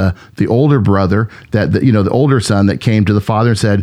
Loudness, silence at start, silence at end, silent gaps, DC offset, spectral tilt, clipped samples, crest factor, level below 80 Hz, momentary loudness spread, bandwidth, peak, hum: -13 LUFS; 0 s; 0 s; none; under 0.1%; -7 dB/octave; under 0.1%; 12 dB; -40 dBFS; 6 LU; 12 kHz; 0 dBFS; none